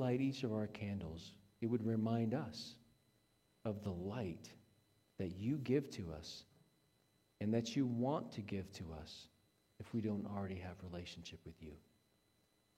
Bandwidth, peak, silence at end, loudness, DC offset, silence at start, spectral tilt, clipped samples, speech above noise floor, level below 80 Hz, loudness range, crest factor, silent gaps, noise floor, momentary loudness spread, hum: 15 kHz; -24 dBFS; 1 s; -43 LUFS; under 0.1%; 0 s; -7 dB/octave; under 0.1%; 36 dB; -68 dBFS; 6 LU; 20 dB; none; -78 dBFS; 17 LU; none